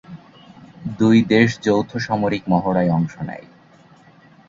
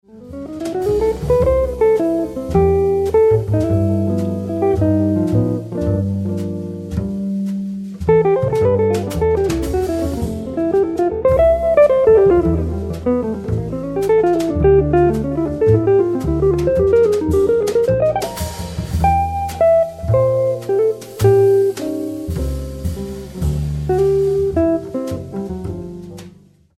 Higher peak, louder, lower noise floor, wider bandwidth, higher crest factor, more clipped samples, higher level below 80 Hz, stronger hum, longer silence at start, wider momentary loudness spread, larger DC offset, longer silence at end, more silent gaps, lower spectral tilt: about the same, -2 dBFS vs -2 dBFS; about the same, -18 LUFS vs -17 LUFS; first, -49 dBFS vs -45 dBFS; second, 7.6 kHz vs 15.5 kHz; about the same, 18 dB vs 14 dB; neither; second, -52 dBFS vs -30 dBFS; neither; about the same, 0.1 s vs 0.15 s; first, 17 LU vs 12 LU; neither; first, 1.1 s vs 0.5 s; neither; about the same, -7 dB/octave vs -8 dB/octave